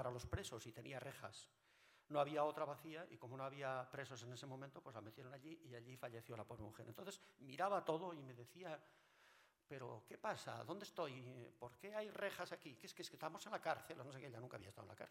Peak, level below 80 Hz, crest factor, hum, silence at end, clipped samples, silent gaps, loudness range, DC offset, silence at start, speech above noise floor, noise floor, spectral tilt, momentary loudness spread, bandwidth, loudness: -26 dBFS; -76 dBFS; 24 dB; none; 0 s; under 0.1%; none; 5 LU; under 0.1%; 0 s; 23 dB; -73 dBFS; -5 dB/octave; 14 LU; 16 kHz; -50 LUFS